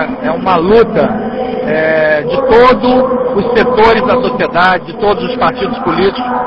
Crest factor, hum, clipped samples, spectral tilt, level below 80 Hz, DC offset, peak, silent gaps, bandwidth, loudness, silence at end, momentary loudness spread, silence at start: 10 dB; none; 0.3%; -7.5 dB/octave; -36 dBFS; under 0.1%; 0 dBFS; none; 8 kHz; -10 LUFS; 0 s; 7 LU; 0 s